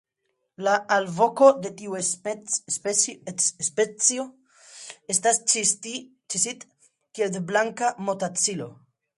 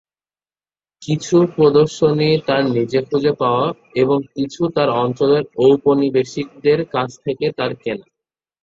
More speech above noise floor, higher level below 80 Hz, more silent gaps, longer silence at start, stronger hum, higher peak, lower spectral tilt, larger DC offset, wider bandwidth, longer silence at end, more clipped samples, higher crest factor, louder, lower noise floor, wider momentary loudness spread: second, 52 dB vs over 74 dB; second, -74 dBFS vs -56 dBFS; neither; second, 0.6 s vs 1 s; neither; about the same, -4 dBFS vs -2 dBFS; second, -2 dB/octave vs -6.5 dB/octave; neither; first, 11.5 kHz vs 7.8 kHz; second, 0.45 s vs 0.6 s; neither; first, 22 dB vs 16 dB; second, -23 LUFS vs -17 LUFS; second, -77 dBFS vs under -90 dBFS; first, 16 LU vs 10 LU